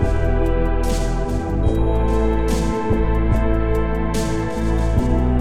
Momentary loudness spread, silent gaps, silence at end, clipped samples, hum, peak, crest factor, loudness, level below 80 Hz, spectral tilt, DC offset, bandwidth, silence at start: 3 LU; none; 0 s; under 0.1%; none; -6 dBFS; 12 dB; -20 LUFS; -20 dBFS; -7 dB/octave; 4%; 13.5 kHz; 0 s